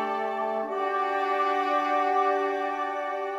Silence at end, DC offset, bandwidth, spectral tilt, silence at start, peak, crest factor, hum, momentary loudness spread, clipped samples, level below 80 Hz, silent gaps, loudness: 0 s; under 0.1%; 12.5 kHz; -3.5 dB/octave; 0 s; -14 dBFS; 14 dB; none; 5 LU; under 0.1%; -76 dBFS; none; -27 LUFS